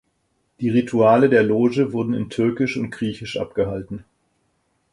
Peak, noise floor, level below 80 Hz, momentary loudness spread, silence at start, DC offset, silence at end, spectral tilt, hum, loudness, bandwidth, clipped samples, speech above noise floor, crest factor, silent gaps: -2 dBFS; -69 dBFS; -52 dBFS; 13 LU; 0.6 s; under 0.1%; 0.9 s; -7.5 dB/octave; none; -20 LUFS; 11 kHz; under 0.1%; 49 dB; 18 dB; none